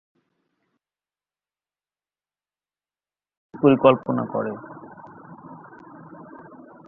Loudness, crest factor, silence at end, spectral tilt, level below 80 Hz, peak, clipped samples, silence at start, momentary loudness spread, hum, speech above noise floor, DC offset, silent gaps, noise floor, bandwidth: -20 LUFS; 24 dB; 0.65 s; -10.5 dB/octave; -66 dBFS; -2 dBFS; under 0.1%; 3.55 s; 27 LU; 50 Hz at -60 dBFS; over 71 dB; under 0.1%; none; under -90 dBFS; 3.8 kHz